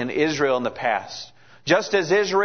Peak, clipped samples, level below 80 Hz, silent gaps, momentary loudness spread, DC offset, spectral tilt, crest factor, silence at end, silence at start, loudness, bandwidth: -4 dBFS; under 0.1%; -62 dBFS; none; 16 LU; 0.3%; -4 dB/octave; 18 dB; 0 s; 0 s; -22 LUFS; 6.6 kHz